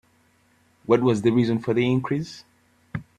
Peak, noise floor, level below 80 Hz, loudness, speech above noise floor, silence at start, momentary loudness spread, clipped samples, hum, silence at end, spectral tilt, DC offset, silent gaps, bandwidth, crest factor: -6 dBFS; -62 dBFS; -60 dBFS; -22 LUFS; 40 dB; 0.9 s; 17 LU; under 0.1%; none; 0.15 s; -7.5 dB/octave; under 0.1%; none; 10 kHz; 20 dB